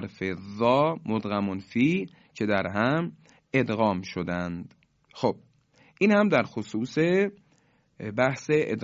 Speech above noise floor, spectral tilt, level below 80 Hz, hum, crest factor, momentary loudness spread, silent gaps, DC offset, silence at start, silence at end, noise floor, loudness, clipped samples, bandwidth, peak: 39 dB; -7 dB/octave; -58 dBFS; none; 20 dB; 11 LU; none; under 0.1%; 0 s; 0 s; -65 dBFS; -26 LUFS; under 0.1%; 7.8 kHz; -8 dBFS